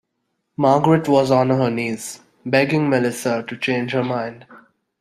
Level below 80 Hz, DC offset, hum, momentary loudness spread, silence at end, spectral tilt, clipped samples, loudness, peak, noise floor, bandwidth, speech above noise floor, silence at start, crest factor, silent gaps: -60 dBFS; under 0.1%; none; 14 LU; 0.45 s; -6 dB/octave; under 0.1%; -19 LUFS; -2 dBFS; -74 dBFS; 15.5 kHz; 55 dB; 0.6 s; 18 dB; none